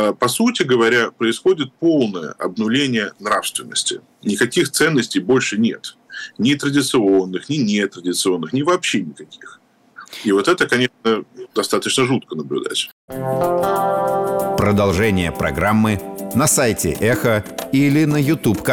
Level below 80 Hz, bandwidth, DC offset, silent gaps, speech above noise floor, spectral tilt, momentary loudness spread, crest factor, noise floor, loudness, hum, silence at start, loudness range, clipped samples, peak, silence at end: -46 dBFS; 19.5 kHz; under 0.1%; 12.92-13.08 s; 25 dB; -4.5 dB/octave; 8 LU; 12 dB; -43 dBFS; -18 LUFS; none; 0 s; 3 LU; under 0.1%; -6 dBFS; 0 s